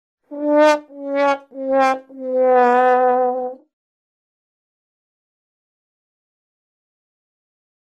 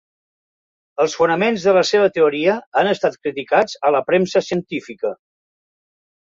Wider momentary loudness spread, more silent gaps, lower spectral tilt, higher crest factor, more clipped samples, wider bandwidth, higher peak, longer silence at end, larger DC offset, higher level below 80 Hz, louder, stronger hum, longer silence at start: about the same, 12 LU vs 11 LU; second, none vs 2.67-2.72 s; second, -3 dB/octave vs -4.5 dB/octave; about the same, 18 dB vs 16 dB; neither; first, 10 kHz vs 7.8 kHz; about the same, -2 dBFS vs -2 dBFS; first, 4.4 s vs 1.05 s; neither; second, -74 dBFS vs -62 dBFS; about the same, -17 LUFS vs -18 LUFS; neither; second, 0.3 s vs 1 s